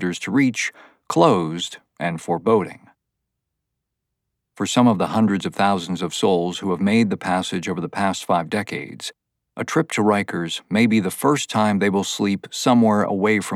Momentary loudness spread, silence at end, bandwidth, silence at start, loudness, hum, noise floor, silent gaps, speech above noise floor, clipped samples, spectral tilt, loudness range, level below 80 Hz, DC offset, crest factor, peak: 11 LU; 0 s; 14.5 kHz; 0 s; -20 LUFS; none; -80 dBFS; none; 60 dB; under 0.1%; -5 dB/octave; 4 LU; -66 dBFS; under 0.1%; 18 dB; -2 dBFS